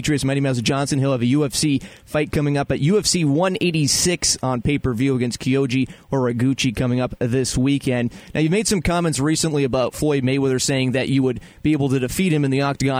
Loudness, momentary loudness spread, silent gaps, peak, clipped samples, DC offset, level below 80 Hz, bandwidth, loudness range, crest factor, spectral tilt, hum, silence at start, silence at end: -20 LUFS; 5 LU; none; -6 dBFS; under 0.1%; under 0.1%; -42 dBFS; 16 kHz; 2 LU; 14 dB; -5 dB/octave; none; 0 s; 0 s